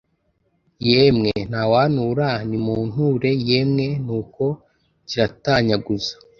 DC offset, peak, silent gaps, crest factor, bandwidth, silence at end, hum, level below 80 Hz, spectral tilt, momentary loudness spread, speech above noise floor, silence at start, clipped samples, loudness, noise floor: under 0.1%; 0 dBFS; none; 20 dB; 7 kHz; 0.25 s; none; -48 dBFS; -7 dB/octave; 9 LU; 48 dB; 0.8 s; under 0.1%; -20 LUFS; -67 dBFS